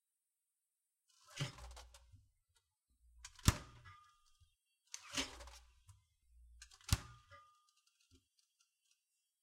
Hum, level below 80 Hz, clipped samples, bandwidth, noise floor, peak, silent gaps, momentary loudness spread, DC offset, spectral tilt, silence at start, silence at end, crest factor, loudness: none; -56 dBFS; under 0.1%; 16 kHz; under -90 dBFS; -12 dBFS; none; 25 LU; under 0.1%; -3.5 dB/octave; 1.3 s; 2 s; 36 dB; -42 LUFS